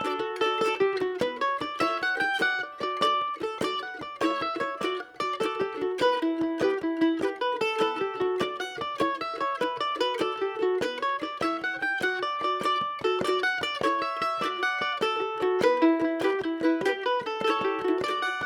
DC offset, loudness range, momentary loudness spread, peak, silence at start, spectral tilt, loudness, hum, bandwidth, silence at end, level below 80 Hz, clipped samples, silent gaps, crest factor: under 0.1%; 3 LU; 5 LU; -10 dBFS; 0 s; -4 dB/octave; -27 LUFS; none; 17.5 kHz; 0 s; -66 dBFS; under 0.1%; none; 16 dB